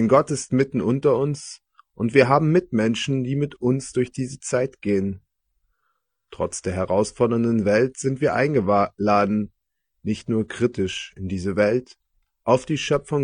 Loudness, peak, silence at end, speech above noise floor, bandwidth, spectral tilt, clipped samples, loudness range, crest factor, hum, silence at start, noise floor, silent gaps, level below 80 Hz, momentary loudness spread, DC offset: -22 LUFS; 0 dBFS; 0 s; 55 dB; 10 kHz; -6 dB/octave; under 0.1%; 5 LU; 22 dB; none; 0 s; -76 dBFS; none; -56 dBFS; 10 LU; under 0.1%